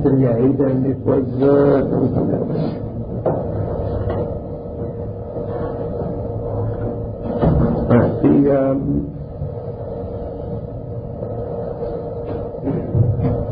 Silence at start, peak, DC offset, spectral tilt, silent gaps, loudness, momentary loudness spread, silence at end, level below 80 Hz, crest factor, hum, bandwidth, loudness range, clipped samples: 0 s; -2 dBFS; under 0.1%; -14.5 dB/octave; none; -20 LUFS; 13 LU; 0 s; -32 dBFS; 16 dB; none; 5 kHz; 8 LU; under 0.1%